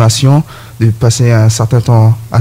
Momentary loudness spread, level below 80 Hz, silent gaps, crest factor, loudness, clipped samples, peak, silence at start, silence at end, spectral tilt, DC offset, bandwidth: 6 LU; -38 dBFS; none; 8 dB; -9 LUFS; under 0.1%; 0 dBFS; 0 s; 0 s; -6 dB/octave; under 0.1%; 15 kHz